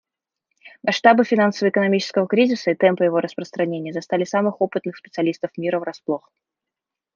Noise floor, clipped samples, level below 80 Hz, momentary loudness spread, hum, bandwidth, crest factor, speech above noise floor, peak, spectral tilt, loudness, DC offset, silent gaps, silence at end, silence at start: -86 dBFS; under 0.1%; -72 dBFS; 12 LU; none; 7.4 kHz; 18 dB; 66 dB; -2 dBFS; -6 dB/octave; -20 LUFS; under 0.1%; none; 1 s; 0.65 s